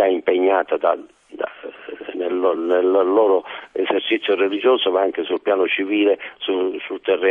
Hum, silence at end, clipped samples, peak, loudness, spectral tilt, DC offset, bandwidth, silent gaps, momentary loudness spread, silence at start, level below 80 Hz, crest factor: none; 0 s; under 0.1%; -4 dBFS; -19 LUFS; -6 dB/octave; under 0.1%; 3.8 kHz; none; 13 LU; 0 s; -68 dBFS; 16 dB